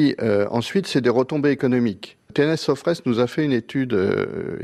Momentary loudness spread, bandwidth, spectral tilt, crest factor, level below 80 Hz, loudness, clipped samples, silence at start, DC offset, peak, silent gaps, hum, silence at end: 5 LU; 13 kHz; -6.5 dB/octave; 14 dB; -60 dBFS; -21 LUFS; under 0.1%; 0 s; under 0.1%; -6 dBFS; none; none; 0 s